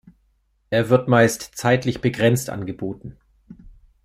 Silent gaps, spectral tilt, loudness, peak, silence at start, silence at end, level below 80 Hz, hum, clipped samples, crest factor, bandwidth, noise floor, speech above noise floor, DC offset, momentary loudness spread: none; -5.5 dB/octave; -20 LUFS; -2 dBFS; 0.7 s; 0.35 s; -52 dBFS; none; under 0.1%; 20 dB; 16 kHz; -65 dBFS; 45 dB; under 0.1%; 14 LU